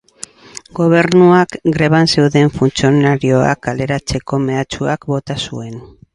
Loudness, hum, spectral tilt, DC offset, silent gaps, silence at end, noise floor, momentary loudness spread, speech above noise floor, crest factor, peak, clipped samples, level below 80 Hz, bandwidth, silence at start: -14 LUFS; none; -6 dB/octave; under 0.1%; none; 0.3 s; -37 dBFS; 19 LU; 24 dB; 14 dB; 0 dBFS; under 0.1%; -40 dBFS; 11.5 kHz; 0.75 s